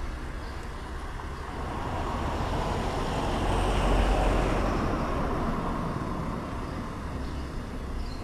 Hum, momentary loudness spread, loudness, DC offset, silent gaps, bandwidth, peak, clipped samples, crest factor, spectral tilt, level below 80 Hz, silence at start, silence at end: none; 12 LU; -31 LUFS; under 0.1%; none; 13.5 kHz; -12 dBFS; under 0.1%; 16 dB; -6 dB/octave; -32 dBFS; 0 s; 0 s